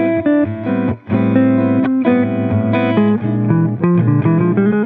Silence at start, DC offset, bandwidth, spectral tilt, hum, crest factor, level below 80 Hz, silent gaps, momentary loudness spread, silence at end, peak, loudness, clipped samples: 0 s; under 0.1%; 4.1 kHz; -12 dB/octave; none; 12 dB; -50 dBFS; none; 4 LU; 0 s; -2 dBFS; -15 LUFS; under 0.1%